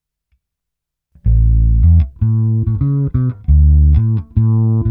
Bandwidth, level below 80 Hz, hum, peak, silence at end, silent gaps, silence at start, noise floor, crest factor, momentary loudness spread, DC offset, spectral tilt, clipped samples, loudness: 1.6 kHz; -16 dBFS; none; -2 dBFS; 0 s; none; 1.25 s; -81 dBFS; 12 dB; 6 LU; under 0.1%; -14 dB/octave; under 0.1%; -14 LUFS